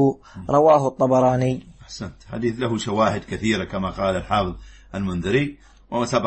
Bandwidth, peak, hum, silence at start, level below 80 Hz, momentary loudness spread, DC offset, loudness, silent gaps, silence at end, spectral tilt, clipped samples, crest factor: 8.8 kHz; -4 dBFS; none; 0 s; -44 dBFS; 17 LU; under 0.1%; -21 LUFS; none; 0 s; -6.5 dB/octave; under 0.1%; 18 dB